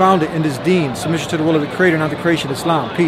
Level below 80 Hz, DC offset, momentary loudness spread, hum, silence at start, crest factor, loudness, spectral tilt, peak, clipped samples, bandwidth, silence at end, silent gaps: -48 dBFS; under 0.1%; 4 LU; none; 0 s; 14 dB; -17 LUFS; -6 dB/octave; 0 dBFS; under 0.1%; 15.5 kHz; 0 s; none